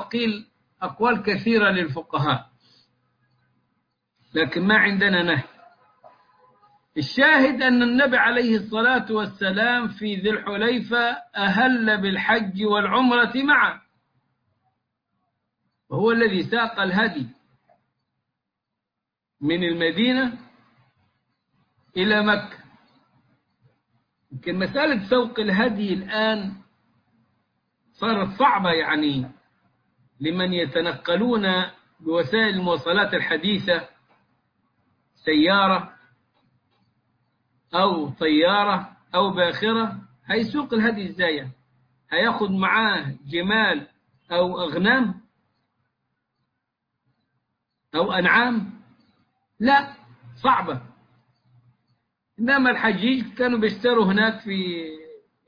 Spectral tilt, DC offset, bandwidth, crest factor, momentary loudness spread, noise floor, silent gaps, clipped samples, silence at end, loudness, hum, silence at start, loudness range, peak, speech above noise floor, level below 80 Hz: -7 dB/octave; under 0.1%; 5.2 kHz; 18 dB; 12 LU; -85 dBFS; none; under 0.1%; 0.3 s; -21 LUFS; none; 0 s; 6 LU; -6 dBFS; 63 dB; -60 dBFS